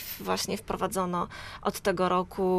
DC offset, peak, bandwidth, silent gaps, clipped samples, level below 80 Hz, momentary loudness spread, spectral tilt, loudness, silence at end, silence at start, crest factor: under 0.1%; -12 dBFS; 15.5 kHz; none; under 0.1%; -52 dBFS; 6 LU; -4.5 dB/octave; -30 LUFS; 0 s; 0 s; 18 dB